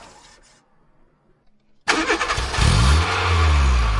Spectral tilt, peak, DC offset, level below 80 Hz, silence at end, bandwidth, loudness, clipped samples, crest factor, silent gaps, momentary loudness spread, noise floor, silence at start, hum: -4.5 dB/octave; -4 dBFS; under 0.1%; -24 dBFS; 0 s; 11.5 kHz; -19 LUFS; under 0.1%; 16 dB; none; 5 LU; -57 dBFS; 1.85 s; none